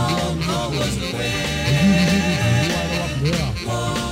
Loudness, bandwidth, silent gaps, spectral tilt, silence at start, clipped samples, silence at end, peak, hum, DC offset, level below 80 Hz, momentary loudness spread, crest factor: -20 LUFS; 16 kHz; none; -5 dB/octave; 0 s; under 0.1%; 0 s; -6 dBFS; none; under 0.1%; -34 dBFS; 7 LU; 14 dB